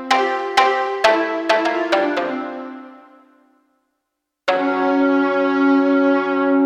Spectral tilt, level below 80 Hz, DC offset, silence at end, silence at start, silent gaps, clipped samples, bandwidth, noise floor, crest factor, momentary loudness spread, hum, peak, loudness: -3.5 dB/octave; -64 dBFS; under 0.1%; 0 s; 0 s; none; under 0.1%; 9.8 kHz; -77 dBFS; 16 dB; 10 LU; none; -2 dBFS; -17 LUFS